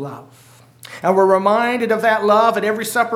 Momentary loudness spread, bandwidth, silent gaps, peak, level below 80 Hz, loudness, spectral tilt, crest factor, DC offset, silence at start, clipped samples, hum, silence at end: 8 LU; 16.5 kHz; none; -2 dBFS; -70 dBFS; -16 LUFS; -4.5 dB/octave; 16 dB; under 0.1%; 0 s; under 0.1%; none; 0 s